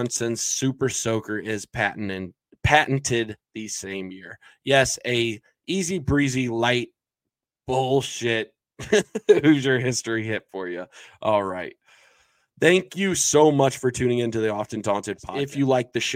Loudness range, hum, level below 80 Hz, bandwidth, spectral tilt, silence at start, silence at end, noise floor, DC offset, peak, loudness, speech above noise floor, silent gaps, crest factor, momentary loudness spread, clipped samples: 3 LU; none; -50 dBFS; 16.5 kHz; -4 dB/octave; 0 s; 0 s; -87 dBFS; under 0.1%; -2 dBFS; -23 LUFS; 64 dB; none; 22 dB; 15 LU; under 0.1%